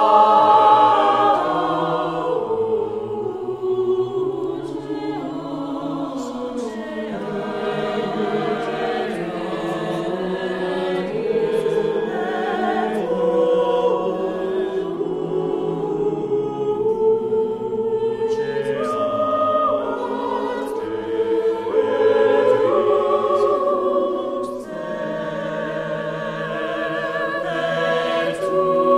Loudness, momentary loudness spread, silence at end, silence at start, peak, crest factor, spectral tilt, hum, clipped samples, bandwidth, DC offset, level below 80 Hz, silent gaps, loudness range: -21 LUFS; 10 LU; 0 s; 0 s; -2 dBFS; 18 dB; -6.5 dB/octave; none; under 0.1%; 11.5 kHz; under 0.1%; -54 dBFS; none; 7 LU